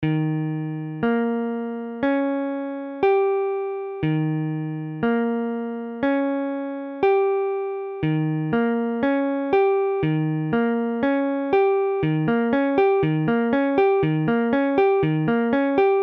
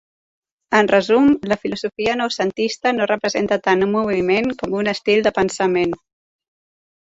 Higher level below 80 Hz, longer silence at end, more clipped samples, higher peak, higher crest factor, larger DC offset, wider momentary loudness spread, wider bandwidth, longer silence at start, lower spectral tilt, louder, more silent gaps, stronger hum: about the same, -56 dBFS vs -54 dBFS; second, 0 s vs 1.15 s; neither; second, -8 dBFS vs -2 dBFS; about the same, 14 dB vs 18 dB; neither; about the same, 8 LU vs 7 LU; second, 5.4 kHz vs 8 kHz; second, 0 s vs 0.7 s; first, -10.5 dB/octave vs -5 dB/octave; second, -22 LUFS vs -18 LUFS; neither; neither